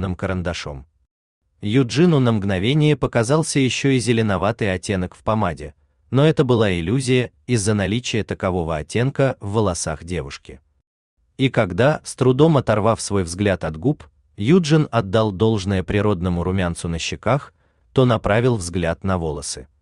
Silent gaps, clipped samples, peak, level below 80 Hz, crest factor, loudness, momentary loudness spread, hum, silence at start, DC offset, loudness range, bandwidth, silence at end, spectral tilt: 1.11-1.41 s, 10.87-11.17 s; under 0.1%; -2 dBFS; -44 dBFS; 18 dB; -20 LUFS; 9 LU; none; 0 s; under 0.1%; 4 LU; 11 kHz; 0.2 s; -6 dB/octave